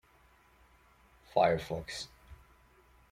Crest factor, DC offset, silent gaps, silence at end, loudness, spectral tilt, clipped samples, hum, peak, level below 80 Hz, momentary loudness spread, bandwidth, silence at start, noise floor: 24 dB; under 0.1%; none; 0.75 s; -33 LUFS; -5 dB/octave; under 0.1%; none; -12 dBFS; -60 dBFS; 14 LU; 16 kHz; 1.35 s; -64 dBFS